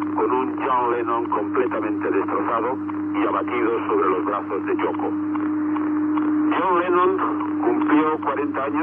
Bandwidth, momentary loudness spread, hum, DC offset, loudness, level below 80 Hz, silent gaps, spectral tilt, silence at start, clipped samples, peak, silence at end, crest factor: 3.6 kHz; 5 LU; none; under 0.1%; -22 LUFS; -76 dBFS; none; -9.5 dB/octave; 0 s; under 0.1%; -8 dBFS; 0 s; 14 dB